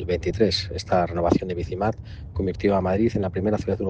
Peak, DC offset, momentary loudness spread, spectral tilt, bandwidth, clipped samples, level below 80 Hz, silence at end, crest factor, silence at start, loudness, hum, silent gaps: -4 dBFS; under 0.1%; 7 LU; -6.5 dB/octave; 9 kHz; under 0.1%; -40 dBFS; 0 s; 18 dB; 0 s; -24 LUFS; none; none